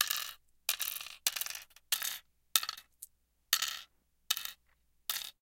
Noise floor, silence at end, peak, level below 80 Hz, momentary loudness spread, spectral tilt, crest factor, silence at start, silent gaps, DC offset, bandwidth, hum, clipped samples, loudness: -72 dBFS; 0.1 s; -4 dBFS; -74 dBFS; 14 LU; 3.5 dB/octave; 36 dB; 0 s; none; under 0.1%; 17 kHz; none; under 0.1%; -35 LUFS